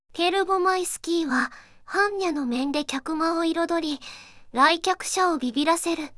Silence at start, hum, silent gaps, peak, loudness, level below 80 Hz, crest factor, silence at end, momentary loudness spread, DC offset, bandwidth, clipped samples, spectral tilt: 0.15 s; none; none; -6 dBFS; -24 LUFS; -58 dBFS; 18 dB; 0.05 s; 9 LU; under 0.1%; 12 kHz; under 0.1%; -1.5 dB/octave